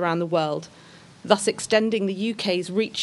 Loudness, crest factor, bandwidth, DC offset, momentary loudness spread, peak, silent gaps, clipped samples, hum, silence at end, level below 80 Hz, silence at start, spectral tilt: -24 LUFS; 22 dB; 11.5 kHz; under 0.1%; 10 LU; -2 dBFS; none; under 0.1%; none; 0 s; -68 dBFS; 0 s; -4 dB/octave